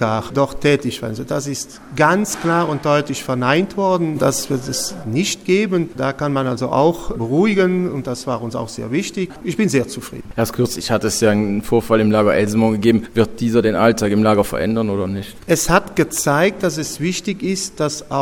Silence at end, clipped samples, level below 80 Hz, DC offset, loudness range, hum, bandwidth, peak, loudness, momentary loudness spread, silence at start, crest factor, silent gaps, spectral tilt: 0 s; under 0.1%; -42 dBFS; under 0.1%; 4 LU; none; 18.5 kHz; 0 dBFS; -18 LUFS; 9 LU; 0 s; 18 dB; none; -5 dB/octave